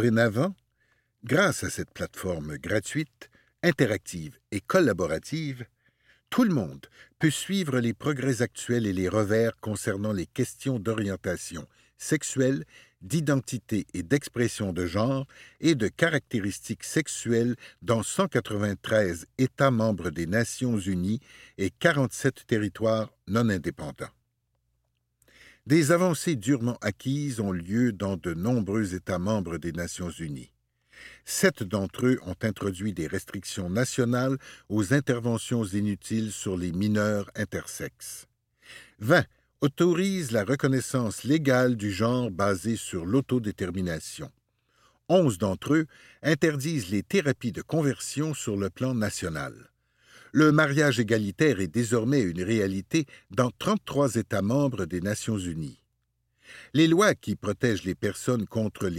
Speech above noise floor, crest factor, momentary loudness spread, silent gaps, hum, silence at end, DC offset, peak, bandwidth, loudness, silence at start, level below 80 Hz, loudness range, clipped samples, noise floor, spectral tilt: 49 dB; 22 dB; 11 LU; none; none; 0 s; under 0.1%; -4 dBFS; 16.5 kHz; -27 LUFS; 0 s; -58 dBFS; 4 LU; under 0.1%; -75 dBFS; -5.5 dB/octave